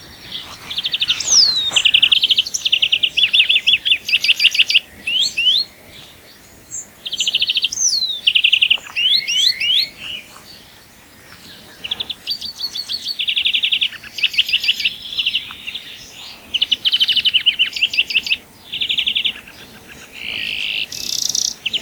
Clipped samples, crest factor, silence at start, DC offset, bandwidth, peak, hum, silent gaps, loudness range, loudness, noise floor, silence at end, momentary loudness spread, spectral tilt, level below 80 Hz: under 0.1%; 18 dB; 0 s; under 0.1%; over 20 kHz; 0 dBFS; none; none; 8 LU; -15 LUFS; -44 dBFS; 0 s; 17 LU; 2 dB/octave; -56 dBFS